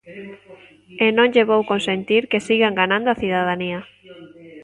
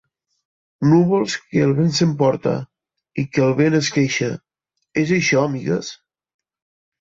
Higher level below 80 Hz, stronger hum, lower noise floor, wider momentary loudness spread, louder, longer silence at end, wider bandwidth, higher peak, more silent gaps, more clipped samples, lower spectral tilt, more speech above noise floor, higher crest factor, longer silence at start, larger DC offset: about the same, -58 dBFS vs -58 dBFS; neither; second, -42 dBFS vs -75 dBFS; first, 15 LU vs 11 LU; about the same, -18 LUFS vs -19 LUFS; second, 0 s vs 1.05 s; first, 11 kHz vs 8 kHz; about the same, -2 dBFS vs -4 dBFS; neither; neither; about the same, -5.5 dB/octave vs -5.5 dB/octave; second, 23 dB vs 58 dB; about the same, 18 dB vs 16 dB; second, 0.05 s vs 0.8 s; neither